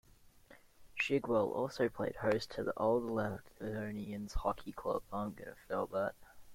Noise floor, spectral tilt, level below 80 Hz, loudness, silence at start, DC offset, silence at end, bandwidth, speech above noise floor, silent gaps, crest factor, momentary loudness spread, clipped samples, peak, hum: -62 dBFS; -6 dB/octave; -54 dBFS; -37 LUFS; 0.25 s; under 0.1%; 0 s; 16.5 kHz; 25 dB; none; 18 dB; 10 LU; under 0.1%; -18 dBFS; none